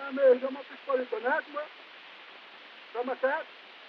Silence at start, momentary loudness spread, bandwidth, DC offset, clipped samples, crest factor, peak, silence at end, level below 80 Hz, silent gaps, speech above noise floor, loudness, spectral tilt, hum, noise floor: 0 s; 23 LU; 5.6 kHz; under 0.1%; under 0.1%; 18 dB; -12 dBFS; 0 s; under -90 dBFS; none; 21 dB; -30 LUFS; -4.5 dB/octave; none; -50 dBFS